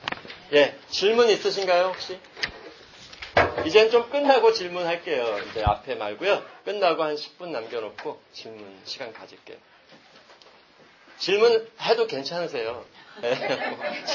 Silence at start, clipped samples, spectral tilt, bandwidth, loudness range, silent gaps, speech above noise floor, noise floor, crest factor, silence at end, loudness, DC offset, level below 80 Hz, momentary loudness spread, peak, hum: 0 s; under 0.1%; -4 dB/octave; 7.2 kHz; 14 LU; none; 30 dB; -54 dBFS; 22 dB; 0 s; -24 LUFS; under 0.1%; -50 dBFS; 21 LU; -4 dBFS; none